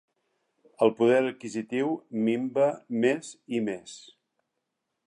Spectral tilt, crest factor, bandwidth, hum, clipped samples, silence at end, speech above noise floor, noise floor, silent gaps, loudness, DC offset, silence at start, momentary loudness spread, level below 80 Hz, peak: -5.5 dB/octave; 20 dB; 11 kHz; none; under 0.1%; 1.05 s; 55 dB; -82 dBFS; none; -27 LUFS; under 0.1%; 0.8 s; 12 LU; -80 dBFS; -10 dBFS